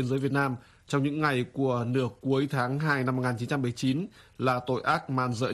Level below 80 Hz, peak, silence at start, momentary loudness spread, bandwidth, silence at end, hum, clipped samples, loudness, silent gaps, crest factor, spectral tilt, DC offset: -62 dBFS; -10 dBFS; 0 s; 4 LU; 13 kHz; 0 s; none; under 0.1%; -28 LUFS; none; 18 dB; -6.5 dB/octave; under 0.1%